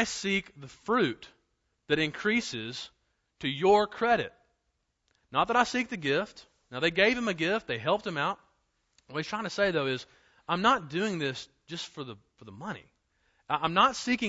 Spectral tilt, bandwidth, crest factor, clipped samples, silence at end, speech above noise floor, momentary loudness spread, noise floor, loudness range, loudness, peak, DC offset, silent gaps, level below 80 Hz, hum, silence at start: -4 dB/octave; 8 kHz; 22 dB; under 0.1%; 0 s; 49 dB; 17 LU; -78 dBFS; 4 LU; -29 LUFS; -10 dBFS; under 0.1%; none; -62 dBFS; none; 0 s